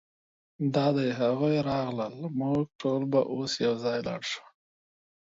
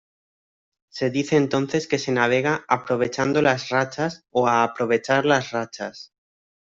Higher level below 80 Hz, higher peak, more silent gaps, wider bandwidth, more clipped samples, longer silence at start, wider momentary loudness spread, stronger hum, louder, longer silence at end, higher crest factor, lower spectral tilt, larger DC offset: about the same, -64 dBFS vs -62 dBFS; second, -12 dBFS vs -2 dBFS; first, 2.75-2.79 s vs none; about the same, 7.8 kHz vs 7.8 kHz; neither; second, 0.6 s vs 0.95 s; about the same, 8 LU vs 9 LU; neither; second, -29 LUFS vs -22 LUFS; first, 0.85 s vs 0.6 s; about the same, 18 dB vs 20 dB; about the same, -6 dB/octave vs -5 dB/octave; neither